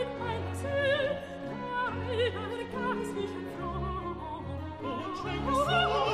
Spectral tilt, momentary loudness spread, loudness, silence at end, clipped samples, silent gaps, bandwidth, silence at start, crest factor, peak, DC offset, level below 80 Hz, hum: -5.5 dB/octave; 11 LU; -32 LUFS; 0 s; under 0.1%; none; 15 kHz; 0 s; 18 dB; -14 dBFS; under 0.1%; -48 dBFS; none